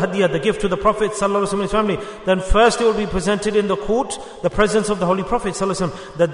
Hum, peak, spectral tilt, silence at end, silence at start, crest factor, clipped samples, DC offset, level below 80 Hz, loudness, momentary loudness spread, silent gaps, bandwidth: none; -2 dBFS; -5 dB/octave; 0 s; 0 s; 16 dB; under 0.1%; under 0.1%; -32 dBFS; -19 LUFS; 7 LU; none; 11 kHz